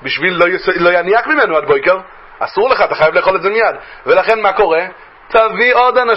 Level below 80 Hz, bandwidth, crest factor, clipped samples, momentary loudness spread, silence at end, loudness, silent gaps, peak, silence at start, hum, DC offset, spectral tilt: -46 dBFS; 5.8 kHz; 12 dB; under 0.1%; 6 LU; 0 s; -12 LUFS; none; 0 dBFS; 0 s; none; under 0.1%; -6.5 dB/octave